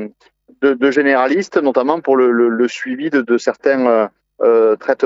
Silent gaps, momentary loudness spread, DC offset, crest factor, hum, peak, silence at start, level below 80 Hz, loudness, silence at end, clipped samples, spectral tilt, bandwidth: none; 6 LU; under 0.1%; 14 dB; none; 0 dBFS; 0 s; -70 dBFS; -15 LUFS; 0 s; under 0.1%; -5.5 dB/octave; 7.8 kHz